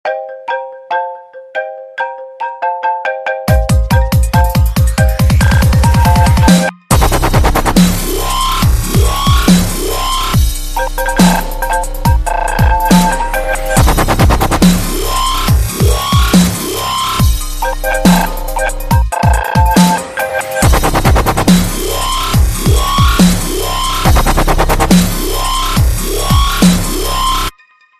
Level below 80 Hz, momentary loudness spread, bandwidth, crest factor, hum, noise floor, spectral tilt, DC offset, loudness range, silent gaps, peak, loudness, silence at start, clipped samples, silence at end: -16 dBFS; 9 LU; 14.5 kHz; 10 dB; none; -44 dBFS; -5 dB/octave; under 0.1%; 3 LU; none; 0 dBFS; -12 LUFS; 0.05 s; under 0.1%; 0.5 s